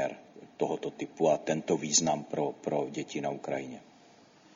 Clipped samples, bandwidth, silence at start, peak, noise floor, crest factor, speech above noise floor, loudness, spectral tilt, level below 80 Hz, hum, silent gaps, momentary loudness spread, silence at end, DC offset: under 0.1%; 7.6 kHz; 0 s; -12 dBFS; -58 dBFS; 20 dB; 27 dB; -31 LUFS; -3.5 dB/octave; -74 dBFS; none; none; 15 LU; 0.75 s; under 0.1%